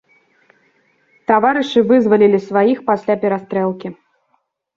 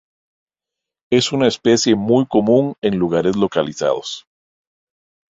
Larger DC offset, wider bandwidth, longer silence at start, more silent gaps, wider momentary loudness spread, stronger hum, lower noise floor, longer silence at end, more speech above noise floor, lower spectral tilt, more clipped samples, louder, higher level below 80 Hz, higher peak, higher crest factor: neither; second, 7.2 kHz vs 8 kHz; first, 1.3 s vs 1.1 s; neither; first, 10 LU vs 6 LU; neither; second, -65 dBFS vs -85 dBFS; second, 0.85 s vs 1.2 s; second, 51 dB vs 69 dB; first, -7 dB/octave vs -5 dB/octave; neither; about the same, -15 LUFS vs -17 LUFS; second, -62 dBFS vs -54 dBFS; about the same, -2 dBFS vs -2 dBFS; about the same, 16 dB vs 16 dB